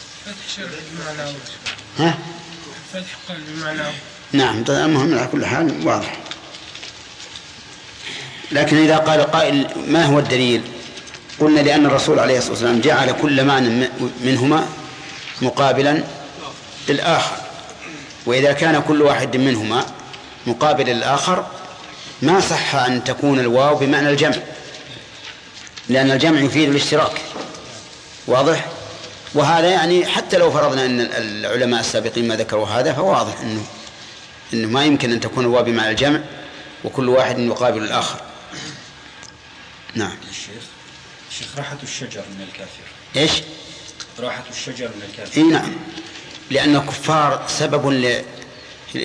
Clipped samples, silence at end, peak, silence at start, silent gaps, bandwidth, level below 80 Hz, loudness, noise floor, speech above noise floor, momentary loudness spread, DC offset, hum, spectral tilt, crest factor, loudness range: under 0.1%; 0 s; -4 dBFS; 0 s; none; 10.5 kHz; -54 dBFS; -17 LUFS; -41 dBFS; 24 dB; 19 LU; under 0.1%; none; -4.5 dB/octave; 16 dB; 8 LU